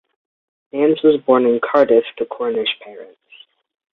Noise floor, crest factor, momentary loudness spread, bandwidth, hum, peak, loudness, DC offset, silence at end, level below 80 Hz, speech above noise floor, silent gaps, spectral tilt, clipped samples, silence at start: -48 dBFS; 16 dB; 14 LU; 4.5 kHz; none; -2 dBFS; -16 LUFS; under 0.1%; 0.9 s; -64 dBFS; 32 dB; none; -7.5 dB/octave; under 0.1%; 0.75 s